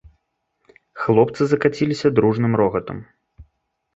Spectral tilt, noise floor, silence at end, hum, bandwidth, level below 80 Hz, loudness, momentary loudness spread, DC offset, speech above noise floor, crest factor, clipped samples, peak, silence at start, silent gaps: -7.5 dB/octave; -71 dBFS; 0.55 s; none; 8 kHz; -52 dBFS; -19 LUFS; 10 LU; under 0.1%; 53 dB; 18 dB; under 0.1%; -2 dBFS; 0.95 s; none